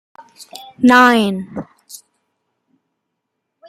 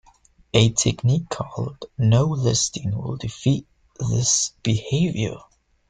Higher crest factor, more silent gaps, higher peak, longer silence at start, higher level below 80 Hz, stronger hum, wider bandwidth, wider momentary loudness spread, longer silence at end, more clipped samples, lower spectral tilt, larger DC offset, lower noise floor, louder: about the same, 18 dB vs 20 dB; neither; about the same, 0 dBFS vs -2 dBFS; second, 0.4 s vs 0.55 s; second, -62 dBFS vs -48 dBFS; neither; first, 15 kHz vs 9.4 kHz; first, 26 LU vs 11 LU; first, 1.75 s vs 0.5 s; neither; about the same, -4.5 dB/octave vs -4.5 dB/octave; neither; first, -75 dBFS vs -56 dBFS; first, -12 LUFS vs -22 LUFS